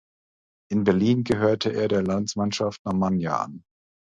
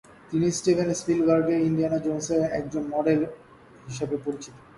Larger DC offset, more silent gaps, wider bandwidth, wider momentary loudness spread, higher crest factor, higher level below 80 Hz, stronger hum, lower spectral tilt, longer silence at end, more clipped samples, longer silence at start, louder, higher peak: neither; first, 2.79-2.85 s vs none; second, 9.6 kHz vs 11.5 kHz; second, 6 LU vs 11 LU; about the same, 18 dB vs 16 dB; about the same, -54 dBFS vs -58 dBFS; neither; about the same, -6 dB/octave vs -6 dB/octave; first, 0.6 s vs 0.2 s; neither; first, 0.7 s vs 0.3 s; about the same, -24 LUFS vs -25 LUFS; about the same, -8 dBFS vs -10 dBFS